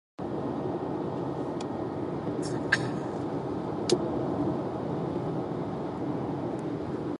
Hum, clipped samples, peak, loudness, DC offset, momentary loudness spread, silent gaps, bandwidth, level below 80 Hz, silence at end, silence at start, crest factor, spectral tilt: none; under 0.1%; -10 dBFS; -32 LUFS; under 0.1%; 6 LU; none; 11.5 kHz; -56 dBFS; 0 s; 0.2 s; 22 dB; -6 dB/octave